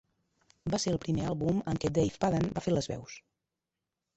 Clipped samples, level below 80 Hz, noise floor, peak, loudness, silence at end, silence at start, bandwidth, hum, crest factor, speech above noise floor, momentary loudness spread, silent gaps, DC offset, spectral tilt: under 0.1%; -54 dBFS; -88 dBFS; -16 dBFS; -32 LUFS; 1 s; 0.65 s; 8.4 kHz; none; 18 dB; 57 dB; 12 LU; none; under 0.1%; -6 dB/octave